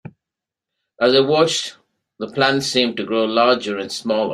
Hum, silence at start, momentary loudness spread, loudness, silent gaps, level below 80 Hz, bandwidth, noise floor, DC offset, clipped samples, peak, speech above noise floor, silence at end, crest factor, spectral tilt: none; 0.05 s; 10 LU; -18 LUFS; none; -62 dBFS; 15 kHz; -86 dBFS; under 0.1%; under 0.1%; -2 dBFS; 68 dB; 0 s; 18 dB; -3.5 dB/octave